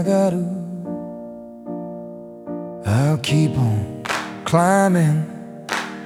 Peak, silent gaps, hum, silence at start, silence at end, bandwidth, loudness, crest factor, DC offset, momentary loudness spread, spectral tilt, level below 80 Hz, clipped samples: -2 dBFS; none; none; 0 s; 0 s; 15.5 kHz; -20 LUFS; 18 dB; under 0.1%; 18 LU; -6.5 dB/octave; -54 dBFS; under 0.1%